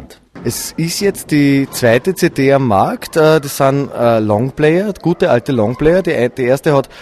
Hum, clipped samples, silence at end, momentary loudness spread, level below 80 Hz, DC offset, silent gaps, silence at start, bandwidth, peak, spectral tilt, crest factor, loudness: none; under 0.1%; 0 s; 5 LU; -40 dBFS; under 0.1%; none; 0 s; 14 kHz; 0 dBFS; -6 dB/octave; 14 dB; -13 LUFS